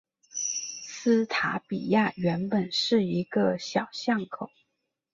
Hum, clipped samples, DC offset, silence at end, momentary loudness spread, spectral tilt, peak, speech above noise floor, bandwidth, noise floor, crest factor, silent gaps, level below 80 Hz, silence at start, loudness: none; under 0.1%; under 0.1%; 0.65 s; 10 LU; -4 dB/octave; -10 dBFS; 54 dB; 7.6 kHz; -81 dBFS; 18 dB; none; -68 dBFS; 0.35 s; -27 LUFS